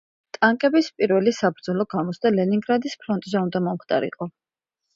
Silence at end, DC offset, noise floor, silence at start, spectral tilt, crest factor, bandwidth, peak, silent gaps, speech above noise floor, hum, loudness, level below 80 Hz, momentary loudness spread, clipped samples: 0.65 s; under 0.1%; -81 dBFS; 0.4 s; -6.5 dB/octave; 18 dB; 7.8 kHz; -4 dBFS; none; 59 dB; none; -22 LUFS; -68 dBFS; 8 LU; under 0.1%